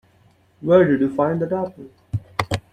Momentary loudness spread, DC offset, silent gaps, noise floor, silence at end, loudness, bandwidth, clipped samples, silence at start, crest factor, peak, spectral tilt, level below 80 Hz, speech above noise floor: 15 LU; under 0.1%; none; -56 dBFS; 0.15 s; -20 LUFS; 14 kHz; under 0.1%; 0.6 s; 20 dB; -2 dBFS; -7.5 dB/octave; -50 dBFS; 38 dB